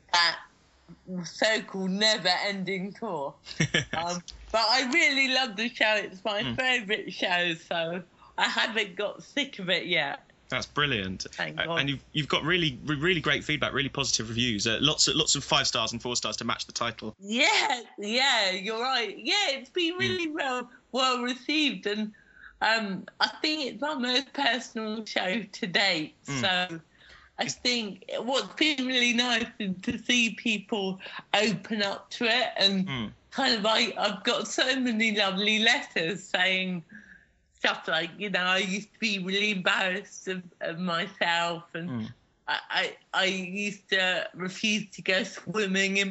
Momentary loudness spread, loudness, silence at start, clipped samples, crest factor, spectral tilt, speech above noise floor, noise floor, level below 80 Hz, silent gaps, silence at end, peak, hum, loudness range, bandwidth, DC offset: 11 LU; -27 LUFS; 0.1 s; under 0.1%; 22 dB; -1.5 dB/octave; 31 dB; -59 dBFS; -60 dBFS; none; 0 s; -8 dBFS; none; 4 LU; 8 kHz; under 0.1%